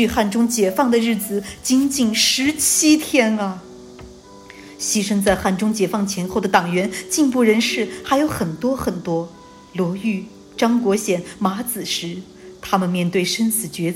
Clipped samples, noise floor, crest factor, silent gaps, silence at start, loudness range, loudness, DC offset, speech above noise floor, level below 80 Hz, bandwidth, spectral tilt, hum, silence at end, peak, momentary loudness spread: under 0.1%; -41 dBFS; 18 dB; none; 0 s; 5 LU; -19 LUFS; under 0.1%; 23 dB; -48 dBFS; 16.5 kHz; -3.5 dB/octave; none; 0 s; -2 dBFS; 10 LU